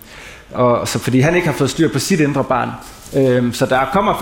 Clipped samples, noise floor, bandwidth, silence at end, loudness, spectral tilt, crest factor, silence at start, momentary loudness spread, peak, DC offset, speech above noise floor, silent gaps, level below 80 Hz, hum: under 0.1%; -37 dBFS; 17 kHz; 0 s; -16 LUFS; -5.5 dB/octave; 14 dB; 0.1 s; 11 LU; -2 dBFS; under 0.1%; 21 dB; none; -42 dBFS; none